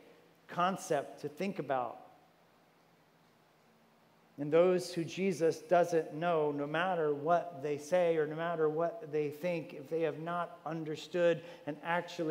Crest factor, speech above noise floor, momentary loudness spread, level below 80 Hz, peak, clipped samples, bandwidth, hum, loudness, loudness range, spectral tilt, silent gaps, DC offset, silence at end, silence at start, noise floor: 18 dB; 33 dB; 11 LU; under -90 dBFS; -16 dBFS; under 0.1%; 16 kHz; none; -34 LUFS; 7 LU; -6 dB/octave; none; under 0.1%; 0 s; 0.5 s; -67 dBFS